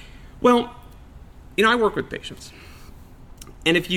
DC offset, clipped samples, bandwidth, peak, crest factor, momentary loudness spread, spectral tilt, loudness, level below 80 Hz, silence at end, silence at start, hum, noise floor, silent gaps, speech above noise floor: under 0.1%; under 0.1%; 16.5 kHz; -4 dBFS; 20 dB; 22 LU; -4.5 dB/octave; -21 LUFS; -46 dBFS; 0 s; 0 s; none; -43 dBFS; none; 23 dB